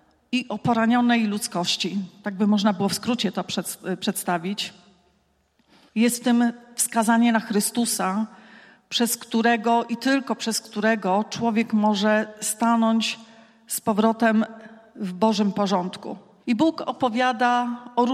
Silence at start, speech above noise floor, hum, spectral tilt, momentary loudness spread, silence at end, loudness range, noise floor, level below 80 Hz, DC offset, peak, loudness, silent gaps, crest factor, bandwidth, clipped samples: 0.3 s; 43 dB; none; -4 dB/octave; 9 LU; 0 s; 3 LU; -66 dBFS; -70 dBFS; under 0.1%; -6 dBFS; -23 LUFS; none; 18 dB; 15.5 kHz; under 0.1%